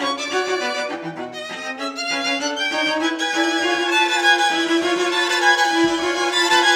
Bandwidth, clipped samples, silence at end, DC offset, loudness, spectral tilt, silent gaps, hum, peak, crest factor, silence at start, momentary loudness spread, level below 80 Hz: 16.5 kHz; under 0.1%; 0 s; under 0.1%; -18 LUFS; -1 dB/octave; none; none; -2 dBFS; 16 dB; 0 s; 12 LU; -64 dBFS